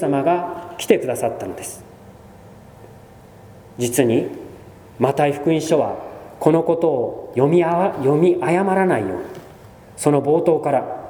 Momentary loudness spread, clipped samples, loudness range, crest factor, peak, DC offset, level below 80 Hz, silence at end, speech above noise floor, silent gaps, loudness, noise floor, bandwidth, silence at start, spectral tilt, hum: 16 LU; under 0.1%; 8 LU; 20 dB; 0 dBFS; under 0.1%; -56 dBFS; 0 s; 25 dB; none; -19 LUFS; -43 dBFS; over 20 kHz; 0 s; -6 dB/octave; none